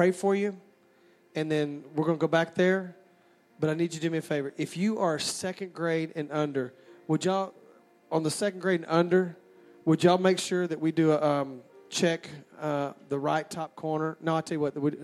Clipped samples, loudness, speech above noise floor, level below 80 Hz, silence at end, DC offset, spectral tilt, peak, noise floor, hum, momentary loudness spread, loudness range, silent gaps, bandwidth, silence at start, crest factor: under 0.1%; -29 LUFS; 34 dB; -76 dBFS; 0 s; under 0.1%; -5.5 dB/octave; -8 dBFS; -62 dBFS; none; 11 LU; 5 LU; none; 14 kHz; 0 s; 20 dB